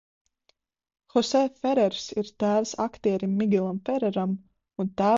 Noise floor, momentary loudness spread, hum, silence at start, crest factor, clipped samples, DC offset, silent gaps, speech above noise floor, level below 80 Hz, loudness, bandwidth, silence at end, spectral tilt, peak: -71 dBFS; 8 LU; none; 1.15 s; 16 dB; under 0.1%; under 0.1%; none; 46 dB; -64 dBFS; -26 LUFS; 7.8 kHz; 0 s; -6 dB/octave; -10 dBFS